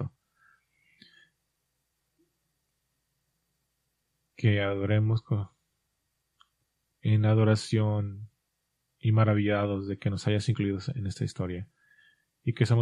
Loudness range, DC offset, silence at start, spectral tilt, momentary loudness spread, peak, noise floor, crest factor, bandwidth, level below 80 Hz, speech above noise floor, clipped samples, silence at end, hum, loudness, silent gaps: 5 LU; under 0.1%; 0 s; -7.5 dB/octave; 12 LU; -10 dBFS; -80 dBFS; 20 dB; 10.5 kHz; -64 dBFS; 53 dB; under 0.1%; 0 s; none; -28 LUFS; none